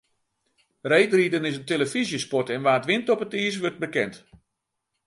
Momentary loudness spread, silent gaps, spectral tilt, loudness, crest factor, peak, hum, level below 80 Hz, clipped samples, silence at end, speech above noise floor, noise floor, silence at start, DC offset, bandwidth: 7 LU; none; -4.5 dB/octave; -24 LUFS; 20 dB; -4 dBFS; none; -68 dBFS; under 0.1%; 0.9 s; 57 dB; -81 dBFS; 0.85 s; under 0.1%; 11.5 kHz